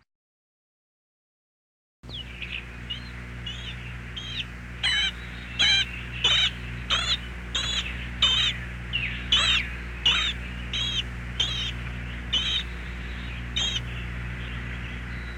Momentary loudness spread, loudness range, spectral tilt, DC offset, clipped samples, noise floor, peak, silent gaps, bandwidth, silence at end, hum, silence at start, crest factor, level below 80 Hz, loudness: 15 LU; 13 LU; -2 dB/octave; under 0.1%; under 0.1%; under -90 dBFS; -10 dBFS; none; 14.5 kHz; 0 s; 60 Hz at -40 dBFS; 2.05 s; 20 dB; -38 dBFS; -26 LUFS